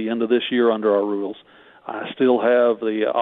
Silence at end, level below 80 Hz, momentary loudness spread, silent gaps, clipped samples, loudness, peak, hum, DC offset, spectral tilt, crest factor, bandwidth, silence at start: 0 s; -72 dBFS; 15 LU; none; under 0.1%; -19 LUFS; -6 dBFS; none; under 0.1%; -8.5 dB/octave; 14 dB; 4.4 kHz; 0 s